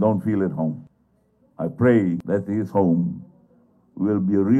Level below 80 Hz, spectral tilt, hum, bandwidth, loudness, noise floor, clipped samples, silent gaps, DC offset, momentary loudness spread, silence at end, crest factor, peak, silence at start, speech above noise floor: -60 dBFS; -10.5 dB/octave; none; 7.4 kHz; -22 LUFS; -63 dBFS; under 0.1%; none; under 0.1%; 12 LU; 0 s; 16 dB; -6 dBFS; 0 s; 43 dB